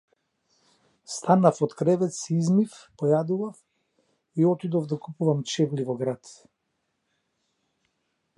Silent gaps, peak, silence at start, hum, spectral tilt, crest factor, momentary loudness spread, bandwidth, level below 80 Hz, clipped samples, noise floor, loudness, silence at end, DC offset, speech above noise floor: none; -6 dBFS; 1.1 s; none; -7 dB/octave; 22 dB; 12 LU; 11.5 kHz; -74 dBFS; under 0.1%; -77 dBFS; -25 LUFS; 2.05 s; under 0.1%; 53 dB